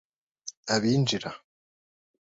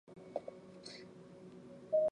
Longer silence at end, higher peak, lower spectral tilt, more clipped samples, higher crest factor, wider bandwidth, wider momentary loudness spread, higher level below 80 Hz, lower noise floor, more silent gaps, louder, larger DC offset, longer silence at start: first, 1 s vs 0 s; first, -10 dBFS vs -24 dBFS; about the same, -4.5 dB/octave vs -5.5 dB/octave; neither; about the same, 20 dB vs 18 dB; second, 7.8 kHz vs 10 kHz; about the same, 19 LU vs 19 LU; first, -66 dBFS vs -80 dBFS; first, under -90 dBFS vs -55 dBFS; first, 0.57-0.63 s vs none; first, -26 LUFS vs -43 LUFS; neither; first, 0.45 s vs 0.1 s